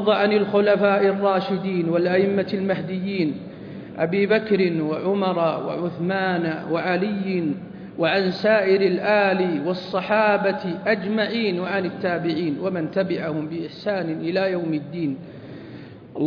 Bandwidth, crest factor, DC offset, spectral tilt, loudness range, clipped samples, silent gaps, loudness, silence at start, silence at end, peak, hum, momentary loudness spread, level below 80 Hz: 5.4 kHz; 16 dB; under 0.1%; -8.5 dB/octave; 4 LU; under 0.1%; none; -22 LUFS; 0 s; 0 s; -6 dBFS; none; 10 LU; -64 dBFS